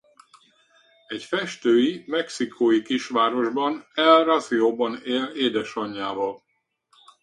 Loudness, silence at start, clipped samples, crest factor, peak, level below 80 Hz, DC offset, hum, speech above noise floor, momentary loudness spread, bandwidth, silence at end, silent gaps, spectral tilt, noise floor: -23 LUFS; 1.1 s; under 0.1%; 22 dB; -2 dBFS; -70 dBFS; under 0.1%; none; 45 dB; 12 LU; 11 kHz; 0.85 s; none; -4 dB/octave; -67 dBFS